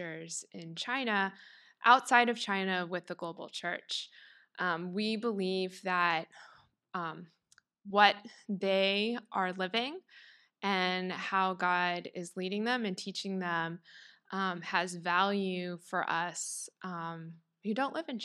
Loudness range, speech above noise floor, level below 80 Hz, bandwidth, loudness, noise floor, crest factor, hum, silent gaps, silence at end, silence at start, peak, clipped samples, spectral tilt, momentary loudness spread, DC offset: 5 LU; 34 dB; under -90 dBFS; 13 kHz; -32 LUFS; -67 dBFS; 26 dB; none; none; 0 s; 0 s; -8 dBFS; under 0.1%; -3.5 dB/octave; 15 LU; under 0.1%